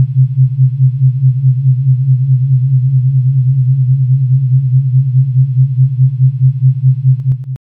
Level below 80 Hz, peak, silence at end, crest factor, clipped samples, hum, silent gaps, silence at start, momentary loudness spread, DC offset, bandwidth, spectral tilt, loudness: -48 dBFS; -2 dBFS; 0.1 s; 8 dB; under 0.1%; none; none; 0 s; 1 LU; under 0.1%; 0.3 kHz; -13 dB/octave; -11 LUFS